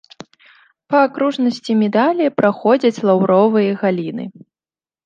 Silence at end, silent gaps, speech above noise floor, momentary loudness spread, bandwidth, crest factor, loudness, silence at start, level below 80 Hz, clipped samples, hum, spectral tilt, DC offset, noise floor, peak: 0.75 s; none; over 75 dB; 8 LU; 7.6 kHz; 16 dB; -16 LUFS; 0.9 s; -68 dBFS; under 0.1%; none; -7 dB/octave; under 0.1%; under -90 dBFS; -2 dBFS